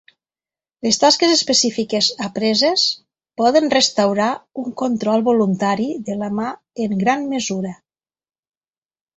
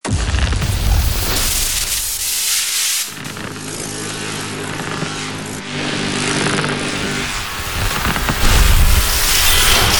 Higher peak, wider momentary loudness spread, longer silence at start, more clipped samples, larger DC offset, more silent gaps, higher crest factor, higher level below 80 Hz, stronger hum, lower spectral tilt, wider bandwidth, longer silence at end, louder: about the same, -2 dBFS vs 0 dBFS; about the same, 12 LU vs 11 LU; first, 0.85 s vs 0.05 s; neither; second, under 0.1% vs 0.6%; neither; about the same, 18 dB vs 16 dB; second, -62 dBFS vs -20 dBFS; neither; about the same, -3.5 dB/octave vs -2.5 dB/octave; second, 8.4 kHz vs over 20 kHz; first, 1.45 s vs 0 s; about the same, -17 LUFS vs -17 LUFS